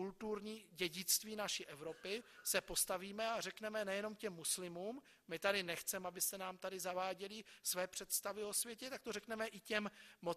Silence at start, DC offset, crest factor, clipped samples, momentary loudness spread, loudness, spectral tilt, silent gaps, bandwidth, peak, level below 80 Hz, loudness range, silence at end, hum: 0 s; under 0.1%; 24 dB; under 0.1%; 11 LU; -42 LUFS; -1.5 dB/octave; none; 14 kHz; -20 dBFS; -74 dBFS; 2 LU; 0 s; none